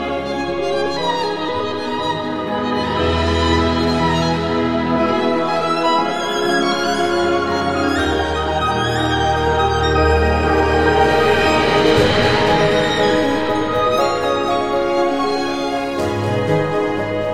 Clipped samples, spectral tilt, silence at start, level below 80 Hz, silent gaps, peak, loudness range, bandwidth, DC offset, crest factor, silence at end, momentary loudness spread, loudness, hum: under 0.1%; -5.5 dB/octave; 0 s; -32 dBFS; none; 0 dBFS; 4 LU; 15.5 kHz; 1%; 16 dB; 0 s; 7 LU; -17 LUFS; none